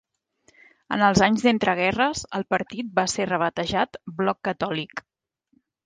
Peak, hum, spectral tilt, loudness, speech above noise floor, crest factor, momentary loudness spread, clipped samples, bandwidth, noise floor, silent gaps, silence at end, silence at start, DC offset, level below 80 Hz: -4 dBFS; none; -4.5 dB/octave; -23 LUFS; 48 dB; 20 dB; 11 LU; under 0.1%; 9.8 kHz; -72 dBFS; none; 0.85 s; 0.9 s; under 0.1%; -54 dBFS